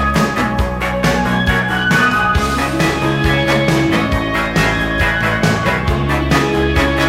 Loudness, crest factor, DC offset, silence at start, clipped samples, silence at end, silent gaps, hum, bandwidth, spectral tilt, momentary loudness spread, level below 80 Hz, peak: -15 LUFS; 14 dB; under 0.1%; 0 s; under 0.1%; 0 s; none; none; 16.5 kHz; -5.5 dB/octave; 3 LU; -24 dBFS; -2 dBFS